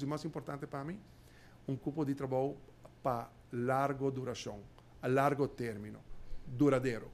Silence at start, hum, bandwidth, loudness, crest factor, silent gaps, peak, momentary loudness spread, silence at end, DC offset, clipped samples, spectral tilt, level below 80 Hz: 0 s; none; 15 kHz; -36 LUFS; 20 dB; none; -16 dBFS; 18 LU; 0 s; under 0.1%; under 0.1%; -7 dB/octave; -58 dBFS